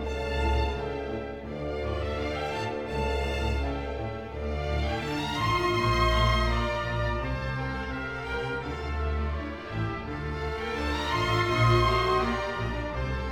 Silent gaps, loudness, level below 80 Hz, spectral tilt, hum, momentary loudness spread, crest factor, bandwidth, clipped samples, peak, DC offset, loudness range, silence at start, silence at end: none; -29 LUFS; -34 dBFS; -6 dB/octave; none; 10 LU; 18 dB; 14.5 kHz; under 0.1%; -10 dBFS; under 0.1%; 5 LU; 0 s; 0 s